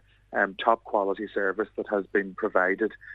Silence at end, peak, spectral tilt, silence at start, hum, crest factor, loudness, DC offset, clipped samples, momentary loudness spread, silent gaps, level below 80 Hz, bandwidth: 0 s; -6 dBFS; -7 dB/octave; 0.3 s; none; 22 dB; -27 LUFS; under 0.1%; under 0.1%; 5 LU; none; -64 dBFS; 6.8 kHz